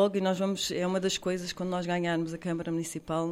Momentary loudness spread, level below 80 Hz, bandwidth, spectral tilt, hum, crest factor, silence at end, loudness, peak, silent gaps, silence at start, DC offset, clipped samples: 5 LU; -62 dBFS; 16 kHz; -5 dB/octave; none; 16 dB; 0 s; -31 LUFS; -14 dBFS; none; 0 s; under 0.1%; under 0.1%